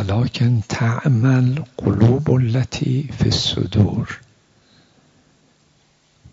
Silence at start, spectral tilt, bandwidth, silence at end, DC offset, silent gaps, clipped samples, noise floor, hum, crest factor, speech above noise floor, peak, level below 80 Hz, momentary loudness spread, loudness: 0 s; -6.5 dB/octave; 7.8 kHz; 2.15 s; under 0.1%; none; under 0.1%; -58 dBFS; none; 16 dB; 41 dB; -2 dBFS; -44 dBFS; 6 LU; -18 LUFS